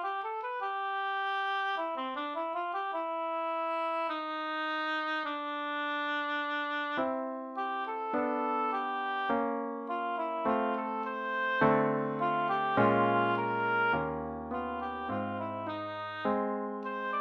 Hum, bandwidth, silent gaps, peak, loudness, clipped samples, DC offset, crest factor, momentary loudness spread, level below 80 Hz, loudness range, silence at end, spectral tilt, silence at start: none; 8.4 kHz; none; -14 dBFS; -32 LUFS; under 0.1%; under 0.1%; 20 dB; 8 LU; -66 dBFS; 5 LU; 0 s; -7 dB/octave; 0 s